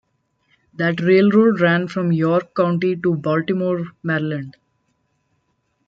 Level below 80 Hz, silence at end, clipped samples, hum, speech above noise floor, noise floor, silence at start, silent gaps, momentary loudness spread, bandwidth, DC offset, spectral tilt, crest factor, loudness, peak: -64 dBFS; 1.35 s; under 0.1%; none; 51 dB; -68 dBFS; 0.8 s; none; 9 LU; 6.8 kHz; under 0.1%; -8.5 dB/octave; 16 dB; -18 LUFS; -4 dBFS